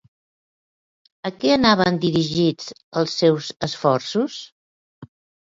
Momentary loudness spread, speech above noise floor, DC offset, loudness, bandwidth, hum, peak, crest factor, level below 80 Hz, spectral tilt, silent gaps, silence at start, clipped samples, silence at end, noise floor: 14 LU; over 70 dB; under 0.1%; -20 LUFS; 7.8 kHz; none; 0 dBFS; 22 dB; -56 dBFS; -5.5 dB/octave; 2.83-2.92 s, 4.52-5.02 s; 1.25 s; under 0.1%; 0.45 s; under -90 dBFS